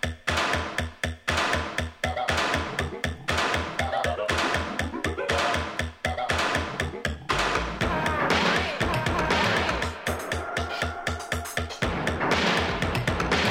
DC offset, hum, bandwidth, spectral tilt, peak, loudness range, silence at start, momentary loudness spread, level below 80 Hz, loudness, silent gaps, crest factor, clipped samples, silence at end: under 0.1%; none; 19 kHz; -4 dB/octave; -8 dBFS; 2 LU; 0.05 s; 7 LU; -40 dBFS; -26 LUFS; none; 18 dB; under 0.1%; 0 s